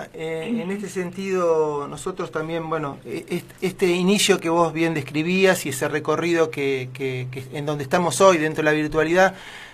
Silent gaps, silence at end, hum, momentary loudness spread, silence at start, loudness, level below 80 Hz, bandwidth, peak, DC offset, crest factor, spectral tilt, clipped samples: none; 0 s; none; 12 LU; 0 s; -22 LUFS; -54 dBFS; 15 kHz; -2 dBFS; under 0.1%; 20 dB; -4.5 dB/octave; under 0.1%